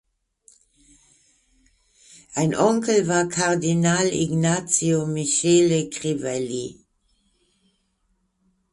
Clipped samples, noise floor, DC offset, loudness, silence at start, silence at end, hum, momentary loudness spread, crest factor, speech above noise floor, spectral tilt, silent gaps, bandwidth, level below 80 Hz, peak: under 0.1%; -69 dBFS; under 0.1%; -21 LUFS; 2.3 s; 2 s; none; 9 LU; 20 dB; 49 dB; -4.5 dB/octave; none; 11.5 kHz; -58 dBFS; -4 dBFS